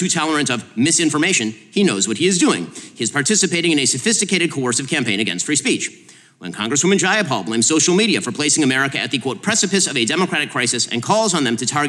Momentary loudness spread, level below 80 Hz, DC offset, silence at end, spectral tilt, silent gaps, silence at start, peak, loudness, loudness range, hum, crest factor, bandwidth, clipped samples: 6 LU; -68 dBFS; under 0.1%; 0 s; -2.5 dB/octave; none; 0 s; -4 dBFS; -17 LUFS; 2 LU; none; 14 dB; 13 kHz; under 0.1%